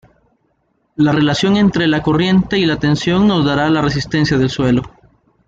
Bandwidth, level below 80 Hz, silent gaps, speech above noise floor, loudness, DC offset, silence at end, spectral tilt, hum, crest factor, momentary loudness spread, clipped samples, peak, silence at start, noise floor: 8 kHz; -40 dBFS; none; 50 dB; -14 LUFS; under 0.1%; 0.6 s; -6.5 dB/octave; none; 12 dB; 4 LU; under 0.1%; -2 dBFS; 1 s; -63 dBFS